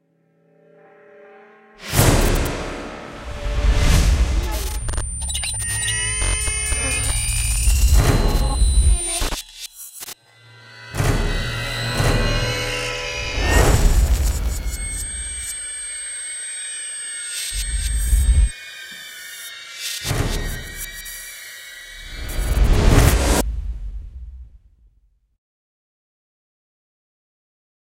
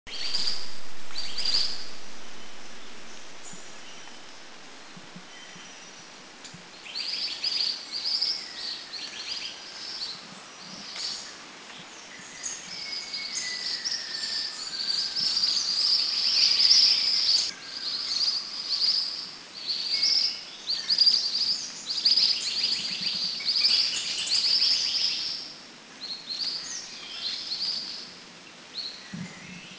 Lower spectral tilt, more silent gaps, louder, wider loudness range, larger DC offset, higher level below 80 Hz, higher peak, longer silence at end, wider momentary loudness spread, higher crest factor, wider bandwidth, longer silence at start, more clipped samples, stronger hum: first, -3.5 dB/octave vs 0.5 dB/octave; neither; first, -21 LUFS vs -25 LUFS; second, 7 LU vs 16 LU; neither; first, -22 dBFS vs -68 dBFS; first, -2 dBFS vs -6 dBFS; first, 3.45 s vs 0 s; second, 17 LU vs 23 LU; about the same, 20 dB vs 24 dB; first, 16.5 kHz vs 8 kHz; first, 1.8 s vs 0.05 s; neither; neither